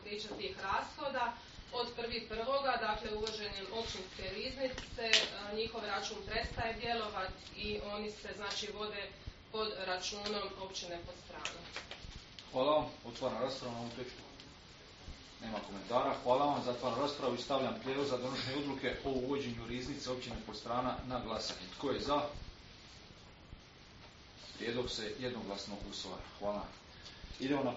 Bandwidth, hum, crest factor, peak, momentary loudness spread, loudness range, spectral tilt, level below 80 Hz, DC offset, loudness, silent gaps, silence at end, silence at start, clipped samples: 7.6 kHz; none; 30 dB; -10 dBFS; 18 LU; 6 LU; -2 dB/octave; -58 dBFS; under 0.1%; -38 LUFS; none; 0 s; 0 s; under 0.1%